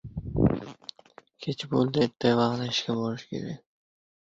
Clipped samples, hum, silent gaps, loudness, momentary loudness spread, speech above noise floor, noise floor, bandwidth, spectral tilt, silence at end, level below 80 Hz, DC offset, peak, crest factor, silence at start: under 0.1%; none; none; -28 LUFS; 17 LU; 29 dB; -55 dBFS; 7.8 kHz; -6.5 dB/octave; 0.65 s; -46 dBFS; under 0.1%; -10 dBFS; 20 dB; 0.05 s